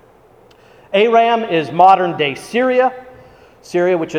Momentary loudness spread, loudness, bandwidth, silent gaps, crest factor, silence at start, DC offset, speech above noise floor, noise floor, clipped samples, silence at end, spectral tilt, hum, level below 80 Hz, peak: 9 LU; -14 LUFS; 14 kHz; none; 16 dB; 0.9 s; under 0.1%; 33 dB; -47 dBFS; under 0.1%; 0 s; -5.5 dB/octave; none; -58 dBFS; 0 dBFS